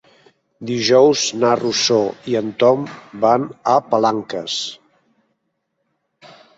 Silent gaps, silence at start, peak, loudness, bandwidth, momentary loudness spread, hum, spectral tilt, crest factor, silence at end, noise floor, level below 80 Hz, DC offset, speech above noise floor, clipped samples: none; 0.6 s; -2 dBFS; -17 LUFS; 8 kHz; 11 LU; none; -4 dB/octave; 18 dB; 0.3 s; -72 dBFS; -64 dBFS; under 0.1%; 55 dB; under 0.1%